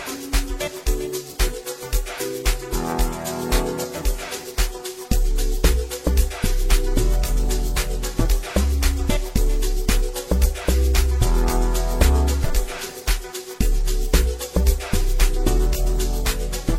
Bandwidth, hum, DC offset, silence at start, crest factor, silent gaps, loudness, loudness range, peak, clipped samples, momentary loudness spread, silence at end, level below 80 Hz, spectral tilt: 16.5 kHz; none; under 0.1%; 0 s; 18 dB; none; -23 LUFS; 4 LU; -2 dBFS; under 0.1%; 6 LU; 0 s; -20 dBFS; -4.5 dB/octave